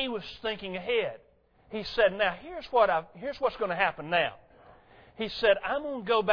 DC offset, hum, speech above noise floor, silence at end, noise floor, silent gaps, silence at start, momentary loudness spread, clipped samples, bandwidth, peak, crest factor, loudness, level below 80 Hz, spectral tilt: under 0.1%; none; 27 dB; 0 s; -56 dBFS; none; 0 s; 12 LU; under 0.1%; 5.4 kHz; -10 dBFS; 20 dB; -29 LUFS; -58 dBFS; -5.5 dB/octave